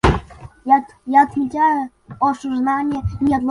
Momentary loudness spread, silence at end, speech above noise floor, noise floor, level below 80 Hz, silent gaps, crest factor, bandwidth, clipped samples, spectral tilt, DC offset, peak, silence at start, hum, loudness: 8 LU; 0 s; 19 dB; -36 dBFS; -32 dBFS; none; 16 dB; 11 kHz; under 0.1%; -7 dB/octave; under 0.1%; -2 dBFS; 0.05 s; none; -18 LUFS